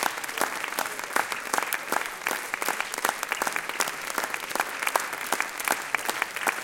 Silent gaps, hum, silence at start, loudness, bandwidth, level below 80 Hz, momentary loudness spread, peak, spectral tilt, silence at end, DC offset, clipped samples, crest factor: none; none; 0 s; -28 LUFS; 17 kHz; -68 dBFS; 3 LU; -4 dBFS; 0 dB/octave; 0 s; under 0.1%; under 0.1%; 26 dB